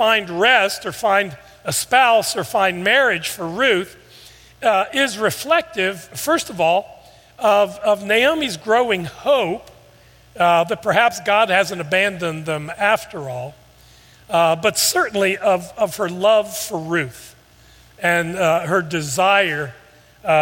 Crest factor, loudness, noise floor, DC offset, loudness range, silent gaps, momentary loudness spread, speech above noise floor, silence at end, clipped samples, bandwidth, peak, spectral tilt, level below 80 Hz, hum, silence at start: 18 dB; -18 LUFS; -49 dBFS; under 0.1%; 3 LU; none; 10 LU; 31 dB; 0 s; under 0.1%; 17 kHz; 0 dBFS; -3 dB/octave; -56 dBFS; none; 0 s